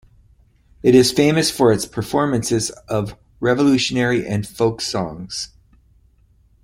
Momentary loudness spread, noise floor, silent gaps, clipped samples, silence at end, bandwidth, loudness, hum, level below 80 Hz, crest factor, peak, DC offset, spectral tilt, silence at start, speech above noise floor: 13 LU; -55 dBFS; none; under 0.1%; 1.2 s; 16.5 kHz; -18 LUFS; none; -48 dBFS; 18 dB; -2 dBFS; under 0.1%; -5 dB/octave; 0.85 s; 37 dB